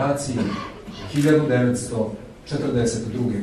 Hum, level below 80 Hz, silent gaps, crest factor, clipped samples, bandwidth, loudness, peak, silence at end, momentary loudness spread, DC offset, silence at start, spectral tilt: none; -46 dBFS; none; 16 dB; under 0.1%; 13 kHz; -22 LUFS; -6 dBFS; 0 s; 13 LU; under 0.1%; 0 s; -6 dB/octave